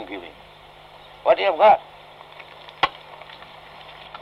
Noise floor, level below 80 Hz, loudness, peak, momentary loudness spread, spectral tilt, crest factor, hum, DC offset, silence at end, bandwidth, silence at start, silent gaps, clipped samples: -46 dBFS; -60 dBFS; -19 LUFS; -6 dBFS; 26 LU; -4.5 dB/octave; 18 dB; 50 Hz at -65 dBFS; under 0.1%; 1.3 s; 6.8 kHz; 0 s; none; under 0.1%